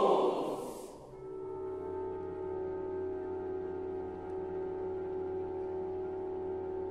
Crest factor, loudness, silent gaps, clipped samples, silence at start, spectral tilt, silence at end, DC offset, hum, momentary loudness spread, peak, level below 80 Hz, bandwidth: 22 dB; -38 LUFS; none; under 0.1%; 0 s; -7 dB/octave; 0 s; under 0.1%; none; 5 LU; -16 dBFS; -62 dBFS; 13 kHz